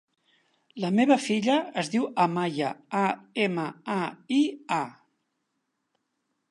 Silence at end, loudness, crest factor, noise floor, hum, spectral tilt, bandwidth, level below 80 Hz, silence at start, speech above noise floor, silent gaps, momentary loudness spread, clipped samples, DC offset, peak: 1.6 s; -27 LUFS; 20 dB; -79 dBFS; none; -5.5 dB/octave; 11.5 kHz; -80 dBFS; 0.75 s; 53 dB; none; 9 LU; under 0.1%; under 0.1%; -8 dBFS